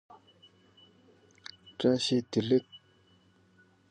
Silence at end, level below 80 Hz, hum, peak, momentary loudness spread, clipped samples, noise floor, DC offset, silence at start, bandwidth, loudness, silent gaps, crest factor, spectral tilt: 1.15 s; -72 dBFS; none; -14 dBFS; 21 LU; under 0.1%; -64 dBFS; under 0.1%; 1.65 s; 9.8 kHz; -29 LUFS; none; 20 dB; -5.5 dB/octave